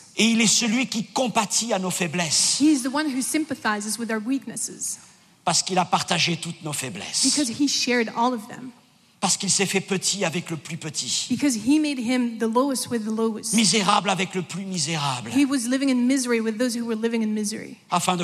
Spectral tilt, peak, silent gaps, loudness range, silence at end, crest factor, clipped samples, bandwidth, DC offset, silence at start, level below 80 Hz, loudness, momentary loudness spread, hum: -3 dB/octave; -6 dBFS; none; 3 LU; 0 s; 18 dB; under 0.1%; 15 kHz; under 0.1%; 0 s; -72 dBFS; -23 LUFS; 11 LU; none